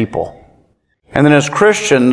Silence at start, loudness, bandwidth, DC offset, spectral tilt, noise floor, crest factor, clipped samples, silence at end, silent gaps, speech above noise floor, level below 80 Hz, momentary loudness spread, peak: 0 s; -12 LUFS; 10.5 kHz; under 0.1%; -5 dB/octave; -56 dBFS; 14 dB; 0.1%; 0 s; none; 45 dB; -46 dBFS; 12 LU; 0 dBFS